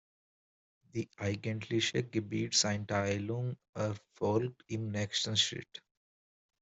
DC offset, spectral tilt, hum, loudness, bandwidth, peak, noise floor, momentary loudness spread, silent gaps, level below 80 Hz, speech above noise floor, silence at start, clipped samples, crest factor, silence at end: under 0.1%; -4 dB/octave; none; -34 LUFS; 8.2 kHz; -14 dBFS; under -90 dBFS; 12 LU; 3.69-3.73 s; -70 dBFS; over 56 dB; 0.95 s; under 0.1%; 20 dB; 0.85 s